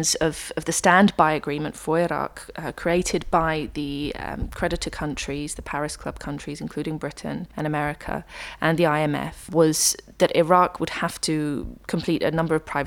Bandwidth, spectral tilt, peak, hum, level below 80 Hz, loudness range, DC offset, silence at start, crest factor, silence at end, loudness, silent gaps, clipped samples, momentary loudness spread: 19 kHz; -4 dB/octave; -2 dBFS; none; -42 dBFS; 8 LU; under 0.1%; 0 s; 22 dB; 0 s; -24 LUFS; none; under 0.1%; 14 LU